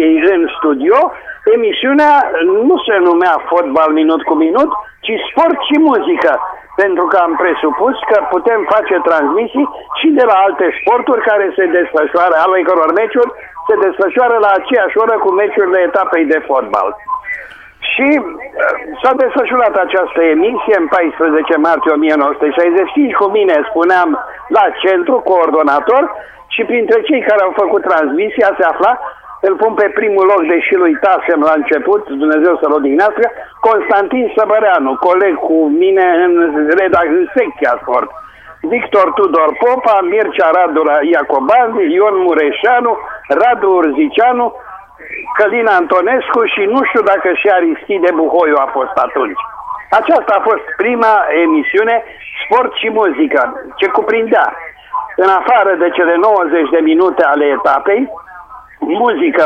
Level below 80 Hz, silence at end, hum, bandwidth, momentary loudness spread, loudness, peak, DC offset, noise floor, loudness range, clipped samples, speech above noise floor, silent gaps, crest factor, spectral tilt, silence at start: -52 dBFS; 0 s; none; 6.4 kHz; 6 LU; -11 LUFS; 0 dBFS; under 0.1%; -34 dBFS; 2 LU; under 0.1%; 23 dB; none; 10 dB; -5.5 dB/octave; 0 s